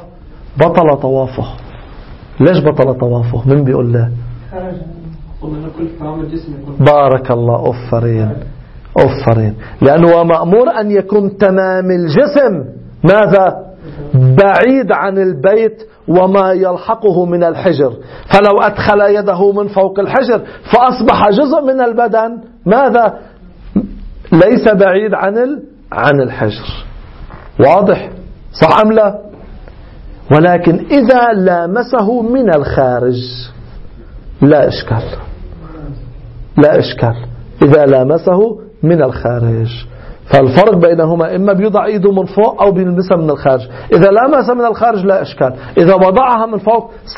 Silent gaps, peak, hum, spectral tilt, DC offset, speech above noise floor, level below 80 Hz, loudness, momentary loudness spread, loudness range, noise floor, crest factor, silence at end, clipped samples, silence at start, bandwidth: none; 0 dBFS; none; -9.5 dB/octave; under 0.1%; 23 dB; -34 dBFS; -10 LUFS; 17 LU; 4 LU; -32 dBFS; 10 dB; 0 s; 0.3%; 0 s; 6.6 kHz